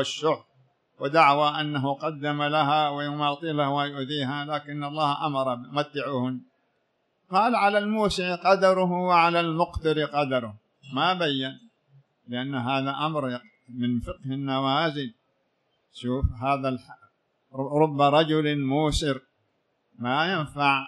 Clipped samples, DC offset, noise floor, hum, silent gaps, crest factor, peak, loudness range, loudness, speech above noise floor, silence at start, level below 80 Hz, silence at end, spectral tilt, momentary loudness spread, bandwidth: under 0.1%; under 0.1%; -73 dBFS; none; none; 20 dB; -6 dBFS; 6 LU; -25 LUFS; 48 dB; 0 s; -46 dBFS; 0 s; -5.5 dB/octave; 13 LU; 12 kHz